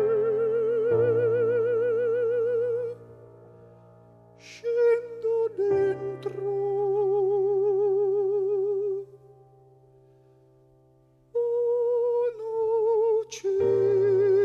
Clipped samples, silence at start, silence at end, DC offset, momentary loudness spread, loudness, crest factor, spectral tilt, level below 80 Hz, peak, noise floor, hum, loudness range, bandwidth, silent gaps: under 0.1%; 0 s; 0 s; under 0.1%; 9 LU; -25 LUFS; 12 dB; -7 dB/octave; -70 dBFS; -14 dBFS; -60 dBFS; none; 6 LU; 7.2 kHz; none